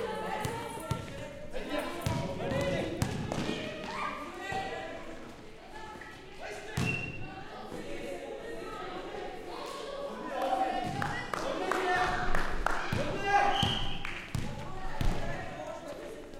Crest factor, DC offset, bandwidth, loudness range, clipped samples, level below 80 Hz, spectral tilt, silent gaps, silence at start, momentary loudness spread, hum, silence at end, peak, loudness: 24 dB; under 0.1%; 16 kHz; 8 LU; under 0.1%; -42 dBFS; -5 dB/octave; none; 0 s; 14 LU; none; 0 s; -10 dBFS; -35 LUFS